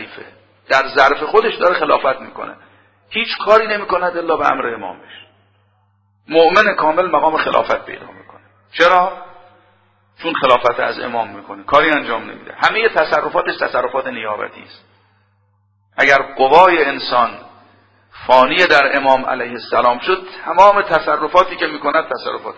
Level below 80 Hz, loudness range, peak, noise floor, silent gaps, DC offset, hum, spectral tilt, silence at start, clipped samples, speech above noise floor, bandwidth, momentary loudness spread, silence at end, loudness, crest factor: -52 dBFS; 5 LU; 0 dBFS; -59 dBFS; none; under 0.1%; none; -4 dB/octave; 0 s; 0.2%; 44 dB; 8 kHz; 15 LU; 0.05 s; -14 LUFS; 16 dB